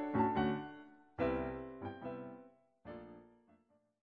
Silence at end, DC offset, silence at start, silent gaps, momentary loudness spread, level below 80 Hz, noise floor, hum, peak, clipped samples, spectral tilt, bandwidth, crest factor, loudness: 0.85 s; under 0.1%; 0 s; none; 22 LU; -60 dBFS; -73 dBFS; none; -22 dBFS; under 0.1%; -9 dB/octave; 4.9 kHz; 20 dB; -39 LUFS